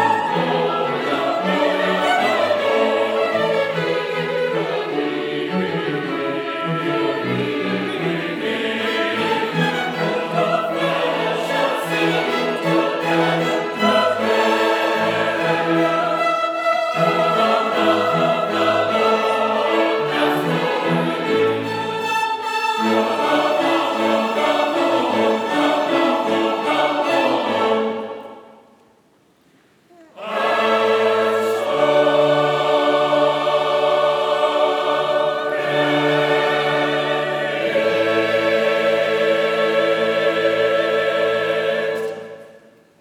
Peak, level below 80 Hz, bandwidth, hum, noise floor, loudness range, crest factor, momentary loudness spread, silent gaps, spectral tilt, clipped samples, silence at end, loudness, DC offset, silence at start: -4 dBFS; -72 dBFS; 19 kHz; none; -56 dBFS; 5 LU; 16 dB; 5 LU; none; -5 dB/octave; under 0.1%; 0.4 s; -18 LUFS; under 0.1%; 0 s